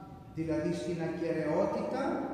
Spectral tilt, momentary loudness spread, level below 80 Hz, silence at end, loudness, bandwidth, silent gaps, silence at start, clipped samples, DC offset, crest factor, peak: -7 dB/octave; 5 LU; -62 dBFS; 0 s; -33 LUFS; 11 kHz; none; 0 s; under 0.1%; under 0.1%; 16 dB; -18 dBFS